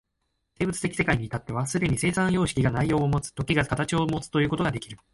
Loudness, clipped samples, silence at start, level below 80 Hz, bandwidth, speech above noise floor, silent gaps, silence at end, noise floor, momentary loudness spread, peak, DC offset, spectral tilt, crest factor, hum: -26 LUFS; under 0.1%; 0.6 s; -46 dBFS; 11.5 kHz; 52 dB; none; 0.15 s; -77 dBFS; 6 LU; -8 dBFS; under 0.1%; -5.5 dB/octave; 18 dB; none